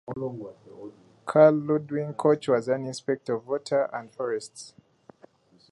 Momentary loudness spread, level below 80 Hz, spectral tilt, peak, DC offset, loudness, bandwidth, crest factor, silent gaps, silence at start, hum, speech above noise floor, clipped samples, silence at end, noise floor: 25 LU; -72 dBFS; -6.5 dB/octave; -4 dBFS; under 0.1%; -26 LUFS; 11.5 kHz; 22 dB; none; 0.1 s; none; 32 dB; under 0.1%; 1.05 s; -57 dBFS